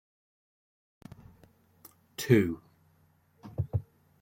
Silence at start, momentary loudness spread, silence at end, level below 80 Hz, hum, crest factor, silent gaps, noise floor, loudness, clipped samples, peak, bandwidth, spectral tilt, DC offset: 2.2 s; 27 LU; 0.4 s; -60 dBFS; none; 26 dB; none; -67 dBFS; -30 LUFS; under 0.1%; -8 dBFS; 16.5 kHz; -6.5 dB/octave; under 0.1%